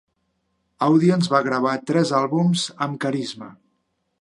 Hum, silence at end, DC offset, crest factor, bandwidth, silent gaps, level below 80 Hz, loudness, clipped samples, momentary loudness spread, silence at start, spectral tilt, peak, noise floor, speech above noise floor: none; 0.65 s; under 0.1%; 20 dB; 11 kHz; none; -68 dBFS; -20 LUFS; under 0.1%; 9 LU; 0.8 s; -6 dB/octave; -2 dBFS; -72 dBFS; 52 dB